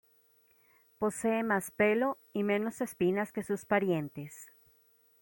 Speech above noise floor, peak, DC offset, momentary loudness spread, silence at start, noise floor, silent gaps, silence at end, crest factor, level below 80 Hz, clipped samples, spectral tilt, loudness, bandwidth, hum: 36 dB; -14 dBFS; under 0.1%; 10 LU; 1 s; -67 dBFS; none; 0.75 s; 18 dB; -72 dBFS; under 0.1%; -5.5 dB/octave; -32 LUFS; 16.5 kHz; none